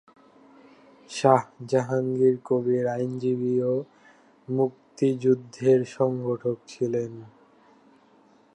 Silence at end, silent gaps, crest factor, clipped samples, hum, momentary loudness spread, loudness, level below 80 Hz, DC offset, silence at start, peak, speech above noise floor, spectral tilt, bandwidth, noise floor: 1.3 s; none; 22 dB; under 0.1%; none; 8 LU; -25 LUFS; -74 dBFS; under 0.1%; 1.1 s; -4 dBFS; 34 dB; -7.5 dB/octave; 10.5 kHz; -58 dBFS